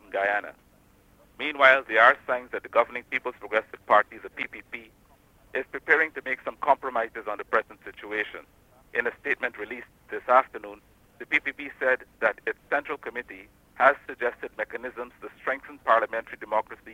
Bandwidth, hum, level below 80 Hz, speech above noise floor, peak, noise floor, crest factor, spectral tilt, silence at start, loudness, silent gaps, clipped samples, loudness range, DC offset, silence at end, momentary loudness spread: 16 kHz; none; -64 dBFS; 32 dB; -4 dBFS; -59 dBFS; 24 dB; -4 dB/octave; 0.1 s; -26 LUFS; none; under 0.1%; 6 LU; under 0.1%; 0 s; 17 LU